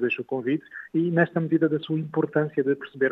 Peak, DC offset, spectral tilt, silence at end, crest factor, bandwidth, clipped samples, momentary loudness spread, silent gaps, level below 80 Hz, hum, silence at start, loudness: -6 dBFS; under 0.1%; -10 dB/octave; 0 s; 18 dB; 4.1 kHz; under 0.1%; 5 LU; none; -74 dBFS; none; 0 s; -25 LUFS